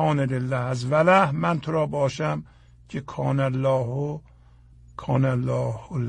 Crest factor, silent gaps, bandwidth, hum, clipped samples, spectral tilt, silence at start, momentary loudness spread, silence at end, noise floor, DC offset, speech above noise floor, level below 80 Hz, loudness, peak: 18 dB; none; 9.6 kHz; none; under 0.1%; -7.5 dB/octave; 0 s; 15 LU; 0 s; -51 dBFS; under 0.1%; 28 dB; -52 dBFS; -24 LUFS; -6 dBFS